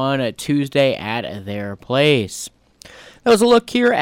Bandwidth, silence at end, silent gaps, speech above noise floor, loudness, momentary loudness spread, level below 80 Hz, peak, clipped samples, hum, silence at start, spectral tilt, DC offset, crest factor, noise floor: 16.5 kHz; 0 s; none; 27 dB; -18 LUFS; 14 LU; -54 dBFS; -4 dBFS; under 0.1%; none; 0 s; -5 dB/octave; under 0.1%; 14 dB; -44 dBFS